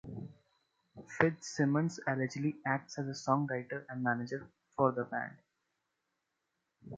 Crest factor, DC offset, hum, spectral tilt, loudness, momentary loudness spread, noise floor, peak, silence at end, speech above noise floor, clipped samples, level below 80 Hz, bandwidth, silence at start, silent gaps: 28 dB; under 0.1%; none; -6.5 dB/octave; -35 LUFS; 14 LU; -85 dBFS; -8 dBFS; 0 s; 51 dB; under 0.1%; -72 dBFS; 9 kHz; 0.05 s; none